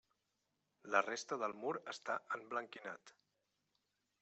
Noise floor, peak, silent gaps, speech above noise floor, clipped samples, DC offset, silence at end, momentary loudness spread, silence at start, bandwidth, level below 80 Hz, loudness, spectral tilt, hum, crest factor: -86 dBFS; -18 dBFS; none; 44 dB; under 0.1%; under 0.1%; 1.1 s; 14 LU; 0.85 s; 8.2 kHz; under -90 dBFS; -42 LUFS; -3 dB/octave; 50 Hz at -85 dBFS; 26 dB